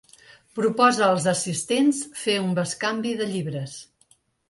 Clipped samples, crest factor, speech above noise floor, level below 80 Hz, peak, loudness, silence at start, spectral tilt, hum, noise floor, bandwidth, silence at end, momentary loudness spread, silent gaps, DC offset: under 0.1%; 20 dB; 39 dB; -68 dBFS; -6 dBFS; -23 LUFS; 0.55 s; -4 dB/octave; none; -62 dBFS; 11.5 kHz; 0.65 s; 13 LU; none; under 0.1%